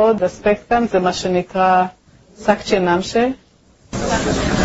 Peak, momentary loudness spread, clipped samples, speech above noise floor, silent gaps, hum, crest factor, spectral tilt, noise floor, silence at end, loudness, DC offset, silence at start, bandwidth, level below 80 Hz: 0 dBFS; 8 LU; under 0.1%; 31 dB; none; none; 16 dB; -5 dB/octave; -47 dBFS; 0 s; -18 LUFS; under 0.1%; 0 s; 8 kHz; -38 dBFS